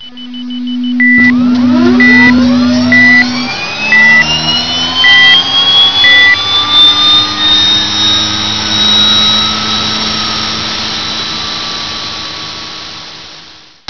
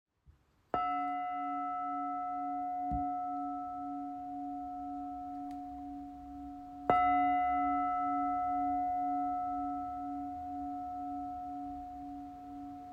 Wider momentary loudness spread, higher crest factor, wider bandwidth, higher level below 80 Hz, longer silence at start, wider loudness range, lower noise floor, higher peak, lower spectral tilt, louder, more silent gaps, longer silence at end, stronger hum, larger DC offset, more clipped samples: about the same, 16 LU vs 14 LU; second, 10 dB vs 24 dB; about the same, 5.4 kHz vs 5 kHz; first, -40 dBFS vs -60 dBFS; second, 0 s vs 0.25 s; about the same, 9 LU vs 9 LU; second, -35 dBFS vs -66 dBFS; first, 0 dBFS vs -12 dBFS; second, -2.5 dB/octave vs -7.5 dB/octave; first, -6 LUFS vs -36 LUFS; neither; about the same, 0.1 s vs 0 s; neither; first, 3% vs under 0.1%; first, 2% vs under 0.1%